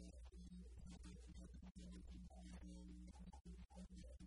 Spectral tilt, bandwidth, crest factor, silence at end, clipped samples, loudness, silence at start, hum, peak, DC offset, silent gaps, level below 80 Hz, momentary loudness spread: -6 dB/octave; 11 kHz; 12 dB; 0 s; under 0.1%; -60 LUFS; 0 s; none; -46 dBFS; under 0.1%; 3.41-3.45 s; -60 dBFS; 2 LU